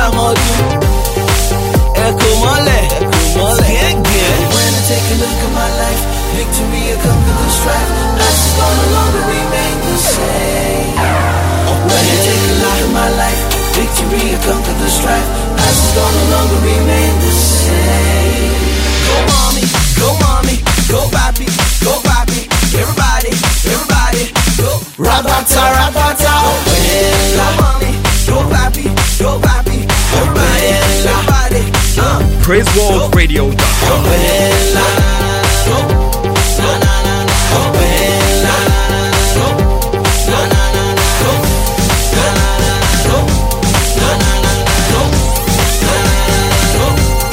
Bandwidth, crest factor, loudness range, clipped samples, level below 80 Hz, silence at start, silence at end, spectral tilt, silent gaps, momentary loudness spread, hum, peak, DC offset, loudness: 16.5 kHz; 10 dB; 2 LU; under 0.1%; -16 dBFS; 0 s; 0 s; -4 dB/octave; none; 3 LU; none; 0 dBFS; under 0.1%; -11 LUFS